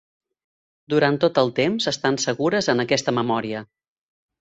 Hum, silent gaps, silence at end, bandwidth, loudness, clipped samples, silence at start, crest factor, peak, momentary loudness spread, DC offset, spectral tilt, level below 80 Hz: none; none; 0.75 s; 8.2 kHz; -21 LUFS; under 0.1%; 0.9 s; 20 dB; -4 dBFS; 5 LU; under 0.1%; -4.5 dB/octave; -62 dBFS